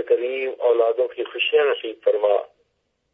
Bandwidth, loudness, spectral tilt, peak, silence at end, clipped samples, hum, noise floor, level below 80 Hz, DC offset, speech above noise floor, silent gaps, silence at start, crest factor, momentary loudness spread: 3.9 kHz; -21 LUFS; -4.5 dB/octave; -6 dBFS; 0.7 s; under 0.1%; none; -72 dBFS; -78 dBFS; under 0.1%; 51 dB; none; 0 s; 16 dB; 6 LU